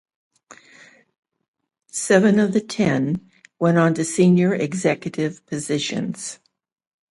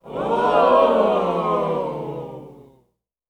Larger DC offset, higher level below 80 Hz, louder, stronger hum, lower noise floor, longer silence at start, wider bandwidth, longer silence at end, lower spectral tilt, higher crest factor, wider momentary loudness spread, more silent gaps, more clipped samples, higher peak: neither; second, -62 dBFS vs -54 dBFS; about the same, -20 LUFS vs -19 LUFS; neither; second, -50 dBFS vs -67 dBFS; first, 0.5 s vs 0.05 s; first, 11.5 kHz vs 10 kHz; about the same, 0.75 s vs 0.7 s; second, -5.5 dB/octave vs -7 dB/octave; about the same, 18 dB vs 18 dB; second, 13 LU vs 17 LU; first, 1.18-1.23 s, 1.48-1.54 s vs none; neither; about the same, -2 dBFS vs -4 dBFS